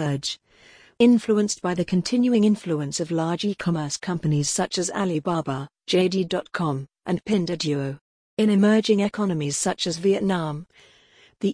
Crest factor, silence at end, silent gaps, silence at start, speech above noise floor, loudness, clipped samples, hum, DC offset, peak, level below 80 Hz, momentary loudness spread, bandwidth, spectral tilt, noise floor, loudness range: 18 dB; 0 s; 8.01-8.37 s; 0 s; 33 dB; -23 LUFS; under 0.1%; none; under 0.1%; -6 dBFS; -60 dBFS; 10 LU; 10.5 kHz; -5 dB/octave; -56 dBFS; 3 LU